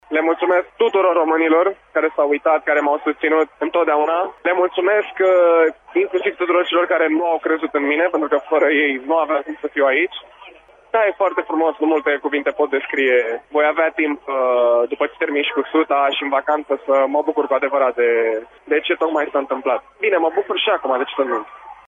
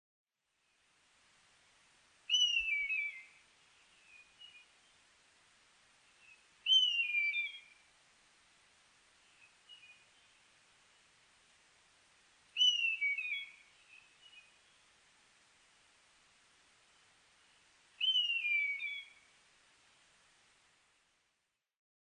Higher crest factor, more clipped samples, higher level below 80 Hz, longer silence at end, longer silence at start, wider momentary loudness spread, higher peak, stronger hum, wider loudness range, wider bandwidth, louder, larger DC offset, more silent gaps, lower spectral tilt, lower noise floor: second, 14 dB vs 22 dB; neither; first, -64 dBFS vs -82 dBFS; second, 0.15 s vs 3 s; second, 0.1 s vs 2.3 s; second, 5 LU vs 28 LU; first, -4 dBFS vs -20 dBFS; neither; second, 2 LU vs 9 LU; second, 7.2 kHz vs 10 kHz; first, -18 LUFS vs -32 LUFS; neither; neither; first, -4.5 dB/octave vs 4 dB/octave; second, -45 dBFS vs -85 dBFS